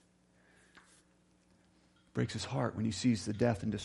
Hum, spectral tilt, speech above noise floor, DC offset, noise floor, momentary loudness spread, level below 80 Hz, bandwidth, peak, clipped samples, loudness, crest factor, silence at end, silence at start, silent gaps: none; -6 dB/octave; 35 dB; under 0.1%; -69 dBFS; 5 LU; -66 dBFS; 11.5 kHz; -16 dBFS; under 0.1%; -35 LUFS; 20 dB; 0 s; 0.75 s; none